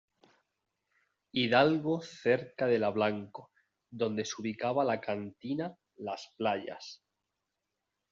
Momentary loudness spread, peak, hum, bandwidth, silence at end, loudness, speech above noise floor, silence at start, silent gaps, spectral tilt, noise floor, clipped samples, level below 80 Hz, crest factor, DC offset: 16 LU; -10 dBFS; none; 7.6 kHz; 1.15 s; -32 LUFS; 54 dB; 1.35 s; none; -4 dB/octave; -86 dBFS; under 0.1%; -76 dBFS; 24 dB; under 0.1%